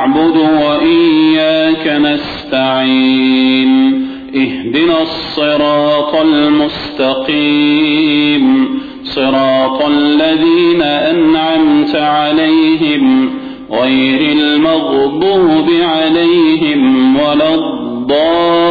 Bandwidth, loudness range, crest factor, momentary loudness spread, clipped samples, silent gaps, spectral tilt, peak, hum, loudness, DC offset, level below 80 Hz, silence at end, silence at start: 4.9 kHz; 1 LU; 8 dB; 6 LU; under 0.1%; none; -7.5 dB/octave; -2 dBFS; none; -10 LUFS; under 0.1%; -44 dBFS; 0 s; 0 s